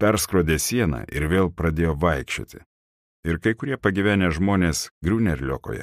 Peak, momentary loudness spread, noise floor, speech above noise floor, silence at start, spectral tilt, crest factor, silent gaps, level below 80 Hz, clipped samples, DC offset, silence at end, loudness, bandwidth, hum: -6 dBFS; 8 LU; under -90 dBFS; over 68 dB; 0 s; -5.5 dB/octave; 18 dB; 2.66-3.23 s, 4.91-5.01 s; -36 dBFS; under 0.1%; under 0.1%; 0 s; -23 LUFS; 15.5 kHz; none